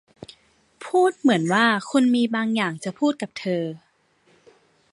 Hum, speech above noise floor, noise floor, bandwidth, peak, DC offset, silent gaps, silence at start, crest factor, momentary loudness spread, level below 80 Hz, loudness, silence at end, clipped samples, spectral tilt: none; 41 dB; -62 dBFS; 11.5 kHz; -4 dBFS; under 0.1%; none; 0.8 s; 20 dB; 10 LU; -72 dBFS; -22 LUFS; 1.15 s; under 0.1%; -5 dB/octave